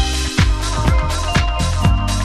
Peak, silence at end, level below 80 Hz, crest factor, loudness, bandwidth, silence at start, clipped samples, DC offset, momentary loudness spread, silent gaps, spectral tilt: -2 dBFS; 0 s; -18 dBFS; 14 dB; -17 LUFS; 13.5 kHz; 0 s; under 0.1%; under 0.1%; 2 LU; none; -4.5 dB/octave